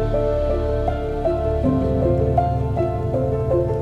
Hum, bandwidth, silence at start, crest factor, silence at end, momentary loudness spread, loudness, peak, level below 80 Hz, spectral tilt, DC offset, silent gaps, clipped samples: none; 7.6 kHz; 0 s; 16 dB; 0 s; 3 LU; -21 LUFS; -4 dBFS; -28 dBFS; -10 dB/octave; under 0.1%; none; under 0.1%